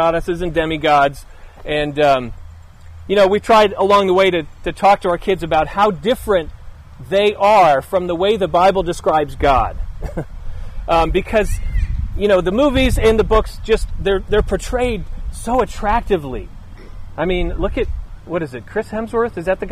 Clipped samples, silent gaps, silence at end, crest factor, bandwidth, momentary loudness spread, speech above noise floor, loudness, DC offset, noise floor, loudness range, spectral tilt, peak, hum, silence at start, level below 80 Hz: under 0.1%; none; 0 s; 14 dB; 15.5 kHz; 15 LU; 21 dB; -16 LUFS; under 0.1%; -37 dBFS; 6 LU; -5.5 dB/octave; -2 dBFS; none; 0 s; -26 dBFS